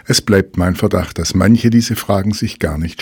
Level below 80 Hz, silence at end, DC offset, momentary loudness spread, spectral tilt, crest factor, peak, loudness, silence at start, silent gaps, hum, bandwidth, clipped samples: -32 dBFS; 0 s; under 0.1%; 8 LU; -5.5 dB/octave; 14 dB; 0 dBFS; -15 LUFS; 0.1 s; none; none; 19 kHz; 0.2%